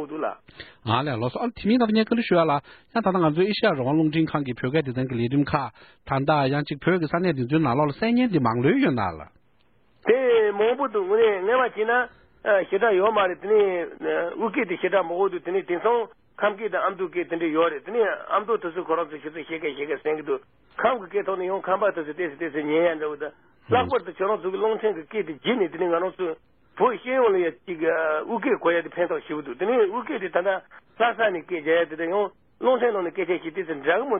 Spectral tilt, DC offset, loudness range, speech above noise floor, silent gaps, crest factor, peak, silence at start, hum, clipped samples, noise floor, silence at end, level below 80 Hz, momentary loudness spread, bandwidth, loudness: -11 dB/octave; under 0.1%; 4 LU; 41 dB; none; 18 dB; -4 dBFS; 0 s; none; under 0.1%; -65 dBFS; 0 s; -60 dBFS; 9 LU; 4.8 kHz; -24 LUFS